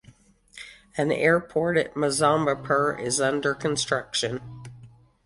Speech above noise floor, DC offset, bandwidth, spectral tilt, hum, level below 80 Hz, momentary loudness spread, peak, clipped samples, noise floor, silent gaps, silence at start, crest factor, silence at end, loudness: 31 dB; under 0.1%; 11.5 kHz; -4 dB/octave; none; -58 dBFS; 21 LU; -6 dBFS; under 0.1%; -55 dBFS; none; 0.55 s; 20 dB; 0.4 s; -24 LUFS